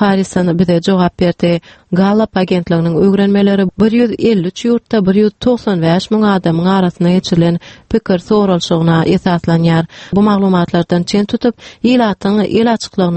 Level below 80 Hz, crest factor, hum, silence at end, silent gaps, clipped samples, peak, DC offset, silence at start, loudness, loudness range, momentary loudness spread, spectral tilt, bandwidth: -42 dBFS; 12 dB; none; 0 s; none; under 0.1%; 0 dBFS; under 0.1%; 0 s; -13 LUFS; 1 LU; 4 LU; -7 dB/octave; 8.6 kHz